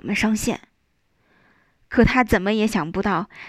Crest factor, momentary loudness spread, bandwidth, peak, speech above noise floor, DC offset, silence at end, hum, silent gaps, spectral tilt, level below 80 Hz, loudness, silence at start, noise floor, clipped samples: 18 dB; 7 LU; 15.5 kHz; -4 dBFS; 48 dB; under 0.1%; 0 s; none; none; -5 dB/octave; -38 dBFS; -21 LUFS; 0.05 s; -68 dBFS; under 0.1%